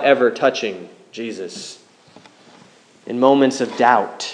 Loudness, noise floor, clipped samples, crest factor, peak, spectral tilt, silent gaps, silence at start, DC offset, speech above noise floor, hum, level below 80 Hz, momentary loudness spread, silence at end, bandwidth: -18 LUFS; -49 dBFS; under 0.1%; 18 dB; 0 dBFS; -4 dB/octave; none; 0 s; under 0.1%; 31 dB; none; -74 dBFS; 21 LU; 0 s; 10.5 kHz